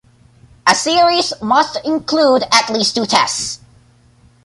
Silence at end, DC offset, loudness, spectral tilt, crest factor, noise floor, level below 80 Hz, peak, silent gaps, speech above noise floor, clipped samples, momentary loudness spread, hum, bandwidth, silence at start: 0.9 s; under 0.1%; -14 LUFS; -2 dB/octave; 16 dB; -50 dBFS; -54 dBFS; 0 dBFS; none; 35 dB; under 0.1%; 7 LU; none; 11.5 kHz; 0.65 s